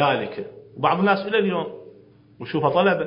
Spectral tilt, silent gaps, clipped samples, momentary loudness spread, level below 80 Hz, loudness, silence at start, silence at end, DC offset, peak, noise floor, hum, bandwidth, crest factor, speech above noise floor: -10.5 dB/octave; none; under 0.1%; 18 LU; -66 dBFS; -22 LUFS; 0 s; 0 s; under 0.1%; -4 dBFS; -50 dBFS; none; 5.4 kHz; 18 dB; 29 dB